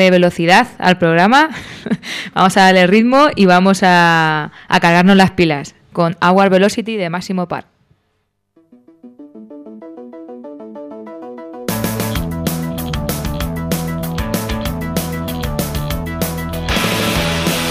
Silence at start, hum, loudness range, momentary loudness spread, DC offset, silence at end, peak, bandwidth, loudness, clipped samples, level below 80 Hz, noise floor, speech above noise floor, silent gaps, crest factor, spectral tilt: 0 s; none; 16 LU; 21 LU; under 0.1%; 0 s; -2 dBFS; 16 kHz; -14 LUFS; under 0.1%; -34 dBFS; -66 dBFS; 54 dB; none; 14 dB; -5 dB/octave